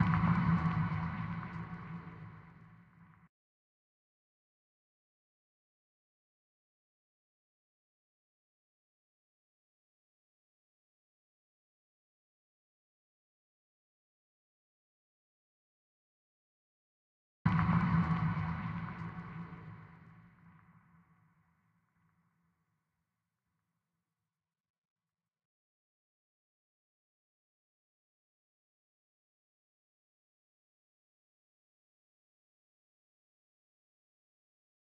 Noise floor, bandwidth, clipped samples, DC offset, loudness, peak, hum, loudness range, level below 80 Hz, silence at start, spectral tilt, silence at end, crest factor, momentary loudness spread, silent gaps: under -90 dBFS; 5.2 kHz; under 0.1%; under 0.1%; -35 LUFS; -16 dBFS; none; 18 LU; -60 dBFS; 0 s; -9.5 dB/octave; 14.7 s; 26 dB; 21 LU; 3.29-17.45 s